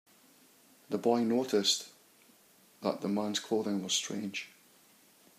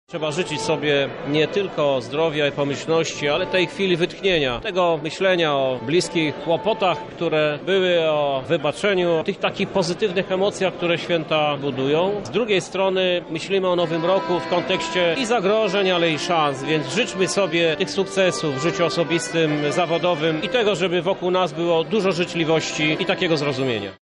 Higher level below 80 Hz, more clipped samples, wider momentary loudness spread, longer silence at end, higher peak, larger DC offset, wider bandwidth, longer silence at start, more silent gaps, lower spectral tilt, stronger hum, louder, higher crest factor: second, -84 dBFS vs -54 dBFS; neither; first, 11 LU vs 4 LU; first, 0.9 s vs 0.1 s; second, -14 dBFS vs -8 dBFS; neither; first, 15.5 kHz vs 11 kHz; first, 0.9 s vs 0.1 s; neither; about the same, -3.5 dB/octave vs -4.5 dB/octave; neither; second, -32 LUFS vs -21 LUFS; first, 20 dB vs 12 dB